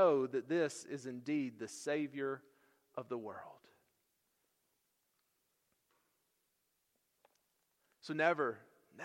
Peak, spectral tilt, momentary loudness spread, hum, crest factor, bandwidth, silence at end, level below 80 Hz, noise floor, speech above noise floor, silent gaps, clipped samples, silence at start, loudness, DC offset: -16 dBFS; -5 dB/octave; 17 LU; none; 24 dB; 16 kHz; 0 s; under -90 dBFS; -82 dBFS; 45 dB; none; under 0.1%; 0 s; -38 LUFS; under 0.1%